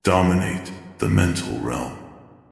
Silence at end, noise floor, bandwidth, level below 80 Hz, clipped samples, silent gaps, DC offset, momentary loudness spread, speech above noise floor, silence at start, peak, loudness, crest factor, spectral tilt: 0.3 s; -44 dBFS; 12 kHz; -46 dBFS; under 0.1%; none; under 0.1%; 15 LU; 24 dB; 0.05 s; -2 dBFS; -22 LUFS; 20 dB; -6 dB/octave